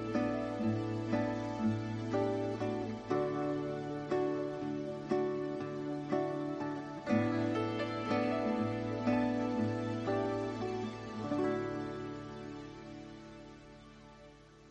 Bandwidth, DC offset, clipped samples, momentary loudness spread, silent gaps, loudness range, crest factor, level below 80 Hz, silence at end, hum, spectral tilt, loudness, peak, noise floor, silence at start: 9.2 kHz; under 0.1%; under 0.1%; 15 LU; none; 6 LU; 18 dB; -64 dBFS; 0 s; none; -7.5 dB/octave; -36 LUFS; -18 dBFS; -57 dBFS; 0 s